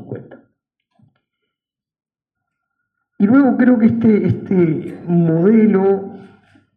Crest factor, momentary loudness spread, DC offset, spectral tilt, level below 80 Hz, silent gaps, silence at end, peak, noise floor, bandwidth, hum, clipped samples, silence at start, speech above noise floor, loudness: 16 dB; 11 LU; under 0.1%; -12 dB/octave; -62 dBFS; none; 0.55 s; -2 dBFS; -85 dBFS; 4.2 kHz; none; under 0.1%; 0 s; 71 dB; -14 LUFS